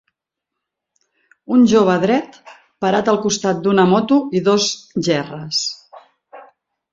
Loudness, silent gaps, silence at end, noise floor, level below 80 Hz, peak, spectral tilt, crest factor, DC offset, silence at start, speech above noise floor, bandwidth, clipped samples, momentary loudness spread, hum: -16 LUFS; none; 0.5 s; -81 dBFS; -58 dBFS; -2 dBFS; -4.5 dB/octave; 16 dB; under 0.1%; 1.5 s; 66 dB; 7.8 kHz; under 0.1%; 9 LU; none